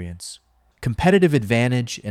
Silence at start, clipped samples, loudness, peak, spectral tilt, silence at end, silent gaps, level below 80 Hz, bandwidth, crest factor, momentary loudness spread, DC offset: 0 s; under 0.1%; -19 LUFS; -4 dBFS; -6 dB/octave; 0 s; none; -44 dBFS; 15 kHz; 16 dB; 18 LU; under 0.1%